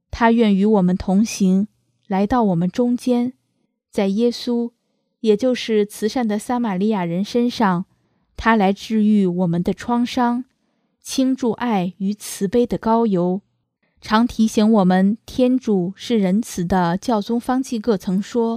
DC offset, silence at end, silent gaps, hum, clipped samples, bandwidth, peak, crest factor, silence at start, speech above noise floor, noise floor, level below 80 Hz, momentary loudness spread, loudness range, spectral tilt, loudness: under 0.1%; 0 s; none; none; under 0.1%; 15 kHz; -2 dBFS; 18 dB; 0.15 s; 52 dB; -70 dBFS; -46 dBFS; 8 LU; 3 LU; -6.5 dB/octave; -19 LUFS